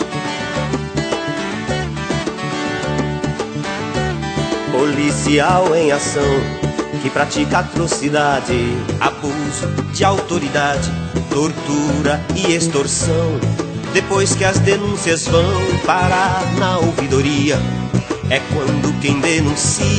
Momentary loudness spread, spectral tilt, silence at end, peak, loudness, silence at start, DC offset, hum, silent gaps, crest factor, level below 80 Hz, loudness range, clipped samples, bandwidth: 7 LU; -4.5 dB/octave; 0 s; 0 dBFS; -17 LUFS; 0 s; under 0.1%; none; none; 16 dB; -36 dBFS; 5 LU; under 0.1%; 9.2 kHz